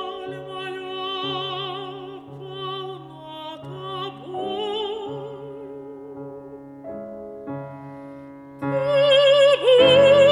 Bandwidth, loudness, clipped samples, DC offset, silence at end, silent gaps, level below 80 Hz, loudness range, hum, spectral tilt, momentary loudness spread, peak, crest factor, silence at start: 11 kHz; -20 LUFS; under 0.1%; under 0.1%; 0 s; none; -62 dBFS; 16 LU; none; -5 dB/octave; 24 LU; -4 dBFS; 18 dB; 0 s